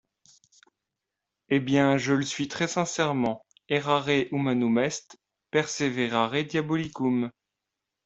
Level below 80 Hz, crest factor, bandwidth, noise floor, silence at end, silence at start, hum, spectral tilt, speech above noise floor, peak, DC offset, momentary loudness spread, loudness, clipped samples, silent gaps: -66 dBFS; 20 dB; 8.2 kHz; -86 dBFS; 0.75 s; 1.5 s; none; -5 dB/octave; 60 dB; -8 dBFS; under 0.1%; 7 LU; -26 LUFS; under 0.1%; none